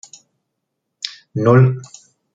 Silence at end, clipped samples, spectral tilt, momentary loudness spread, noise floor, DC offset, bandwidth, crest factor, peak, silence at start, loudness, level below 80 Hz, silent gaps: 0.5 s; under 0.1%; -7 dB/octave; 17 LU; -76 dBFS; under 0.1%; 7.8 kHz; 18 dB; -2 dBFS; 1.05 s; -15 LUFS; -60 dBFS; none